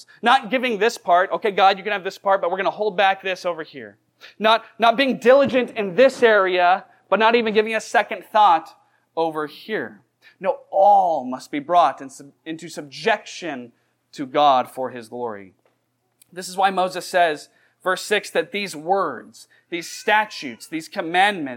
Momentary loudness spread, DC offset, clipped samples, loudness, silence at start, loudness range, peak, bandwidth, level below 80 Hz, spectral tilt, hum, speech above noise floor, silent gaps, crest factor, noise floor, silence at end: 16 LU; under 0.1%; under 0.1%; -20 LUFS; 0.25 s; 6 LU; -4 dBFS; 16.5 kHz; -78 dBFS; -3.5 dB/octave; none; 49 dB; none; 18 dB; -69 dBFS; 0 s